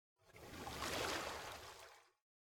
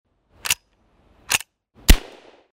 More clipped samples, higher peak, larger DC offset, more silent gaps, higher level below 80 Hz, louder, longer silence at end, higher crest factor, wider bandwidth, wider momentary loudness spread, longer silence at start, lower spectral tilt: neither; second, -28 dBFS vs 0 dBFS; neither; neither; second, -66 dBFS vs -24 dBFS; second, -46 LUFS vs -22 LUFS; about the same, 0.55 s vs 0.55 s; about the same, 20 dB vs 22 dB; about the same, 17.5 kHz vs 16 kHz; about the same, 19 LU vs 18 LU; second, 0.25 s vs 0.45 s; about the same, -2.5 dB/octave vs -2.5 dB/octave